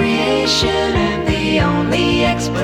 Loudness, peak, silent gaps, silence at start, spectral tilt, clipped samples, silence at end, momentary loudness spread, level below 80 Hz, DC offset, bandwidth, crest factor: -15 LUFS; -4 dBFS; none; 0 s; -5 dB/octave; under 0.1%; 0 s; 3 LU; -30 dBFS; under 0.1%; 17.5 kHz; 12 dB